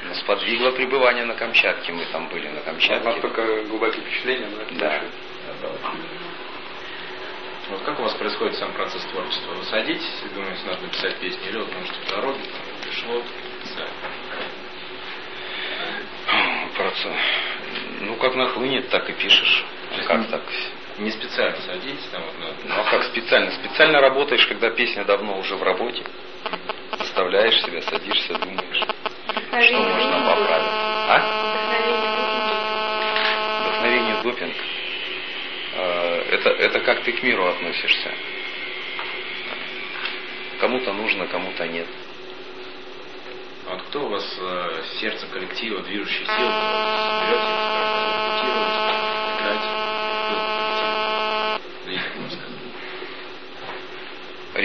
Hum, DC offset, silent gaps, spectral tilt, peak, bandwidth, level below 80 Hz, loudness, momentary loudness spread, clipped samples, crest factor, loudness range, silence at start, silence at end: none; 1%; none; -4 dB/octave; 0 dBFS; 6.6 kHz; -66 dBFS; -22 LUFS; 15 LU; under 0.1%; 22 dB; 9 LU; 0 s; 0 s